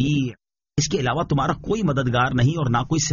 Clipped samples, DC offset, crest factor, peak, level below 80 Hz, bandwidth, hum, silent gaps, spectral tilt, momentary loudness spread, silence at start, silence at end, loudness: under 0.1%; under 0.1%; 14 dB; -6 dBFS; -42 dBFS; 7.4 kHz; none; none; -5.5 dB/octave; 5 LU; 0 s; 0 s; -22 LUFS